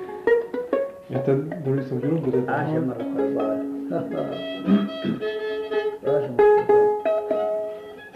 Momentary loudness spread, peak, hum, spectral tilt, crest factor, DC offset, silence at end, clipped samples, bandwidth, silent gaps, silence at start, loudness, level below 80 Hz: 10 LU; -8 dBFS; none; -8.5 dB/octave; 16 dB; under 0.1%; 0.05 s; under 0.1%; 6 kHz; none; 0 s; -23 LUFS; -60 dBFS